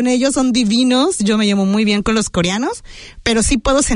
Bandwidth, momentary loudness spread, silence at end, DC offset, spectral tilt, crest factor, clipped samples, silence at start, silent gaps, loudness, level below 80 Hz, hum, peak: 11 kHz; 6 LU; 0 s; under 0.1%; -4 dB/octave; 14 dB; under 0.1%; 0 s; none; -15 LUFS; -32 dBFS; none; -2 dBFS